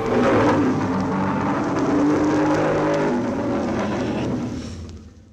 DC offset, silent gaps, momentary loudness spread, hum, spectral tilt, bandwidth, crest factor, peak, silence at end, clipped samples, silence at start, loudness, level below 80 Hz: under 0.1%; none; 10 LU; none; -7 dB/octave; 9 kHz; 12 dB; -8 dBFS; 0.2 s; under 0.1%; 0 s; -21 LUFS; -44 dBFS